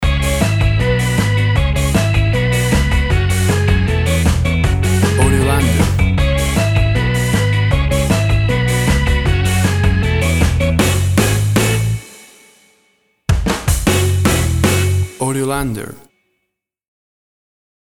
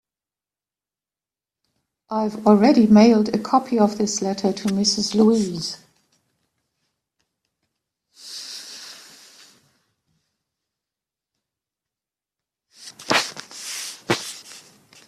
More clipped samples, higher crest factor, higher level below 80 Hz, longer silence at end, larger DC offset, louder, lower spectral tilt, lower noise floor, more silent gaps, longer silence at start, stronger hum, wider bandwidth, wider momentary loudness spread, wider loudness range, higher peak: neither; second, 14 dB vs 20 dB; first, -22 dBFS vs -62 dBFS; first, 1.9 s vs 0.5 s; neither; first, -15 LUFS vs -19 LUFS; about the same, -5.5 dB/octave vs -4.5 dB/octave; second, -74 dBFS vs under -90 dBFS; neither; second, 0 s vs 2.1 s; neither; first, 17 kHz vs 13.5 kHz; second, 4 LU vs 22 LU; second, 3 LU vs 22 LU; about the same, 0 dBFS vs -2 dBFS